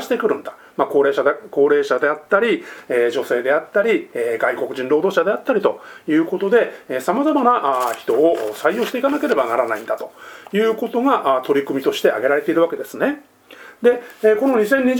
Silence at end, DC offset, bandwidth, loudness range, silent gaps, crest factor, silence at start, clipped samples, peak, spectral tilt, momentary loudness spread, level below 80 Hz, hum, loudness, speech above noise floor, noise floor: 0 s; under 0.1%; 20 kHz; 1 LU; none; 18 dB; 0 s; under 0.1%; 0 dBFS; -5 dB/octave; 7 LU; -68 dBFS; none; -18 LUFS; 25 dB; -43 dBFS